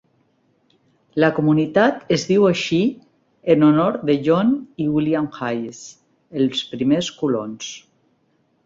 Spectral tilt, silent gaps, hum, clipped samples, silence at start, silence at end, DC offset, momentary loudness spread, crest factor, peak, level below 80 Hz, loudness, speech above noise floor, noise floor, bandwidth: -6 dB/octave; none; none; under 0.1%; 1.15 s; 0.85 s; under 0.1%; 15 LU; 18 dB; -2 dBFS; -60 dBFS; -19 LUFS; 45 dB; -64 dBFS; 7.6 kHz